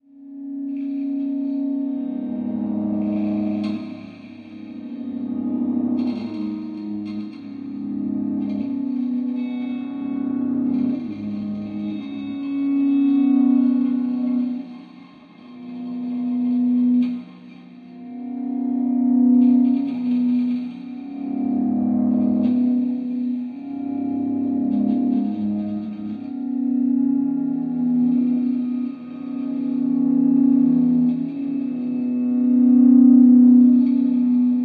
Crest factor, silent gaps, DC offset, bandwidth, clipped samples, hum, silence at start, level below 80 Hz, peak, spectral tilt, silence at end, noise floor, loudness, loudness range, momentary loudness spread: 16 dB; none; under 0.1%; 4.6 kHz; under 0.1%; none; 0.15 s; -66 dBFS; -4 dBFS; -10.5 dB/octave; 0 s; -44 dBFS; -20 LUFS; 9 LU; 15 LU